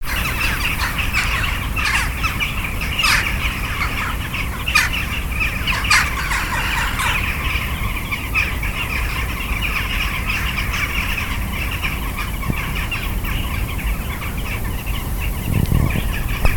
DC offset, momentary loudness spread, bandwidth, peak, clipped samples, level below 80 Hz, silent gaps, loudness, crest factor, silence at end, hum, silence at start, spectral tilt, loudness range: 0.2%; 8 LU; 19 kHz; 0 dBFS; under 0.1%; -24 dBFS; none; -20 LUFS; 20 dB; 0 s; none; 0 s; -3.5 dB/octave; 5 LU